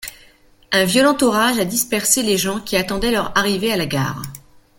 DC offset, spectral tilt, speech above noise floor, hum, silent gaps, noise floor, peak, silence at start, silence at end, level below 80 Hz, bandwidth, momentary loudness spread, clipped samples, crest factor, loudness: under 0.1%; -3 dB/octave; 32 dB; none; none; -50 dBFS; 0 dBFS; 0 s; 0.4 s; -42 dBFS; 17 kHz; 8 LU; under 0.1%; 18 dB; -17 LUFS